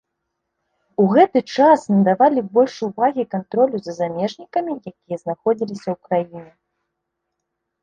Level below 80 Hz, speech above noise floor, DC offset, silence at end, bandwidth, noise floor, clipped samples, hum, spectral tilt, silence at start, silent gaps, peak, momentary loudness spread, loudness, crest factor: -64 dBFS; 60 dB; under 0.1%; 1.4 s; 9 kHz; -78 dBFS; under 0.1%; none; -7.5 dB/octave; 1 s; none; -2 dBFS; 14 LU; -19 LUFS; 18 dB